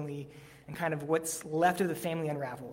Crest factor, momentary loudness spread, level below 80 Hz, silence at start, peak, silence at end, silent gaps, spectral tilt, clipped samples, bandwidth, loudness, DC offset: 20 dB; 17 LU; -68 dBFS; 0 s; -14 dBFS; 0 s; none; -5 dB/octave; under 0.1%; 16.5 kHz; -32 LUFS; under 0.1%